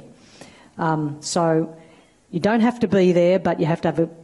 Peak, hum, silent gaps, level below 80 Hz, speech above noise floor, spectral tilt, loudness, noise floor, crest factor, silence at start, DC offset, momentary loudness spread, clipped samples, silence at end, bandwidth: -8 dBFS; none; none; -58 dBFS; 32 dB; -6.5 dB/octave; -20 LUFS; -51 dBFS; 14 dB; 0.4 s; under 0.1%; 9 LU; under 0.1%; 0 s; 11.5 kHz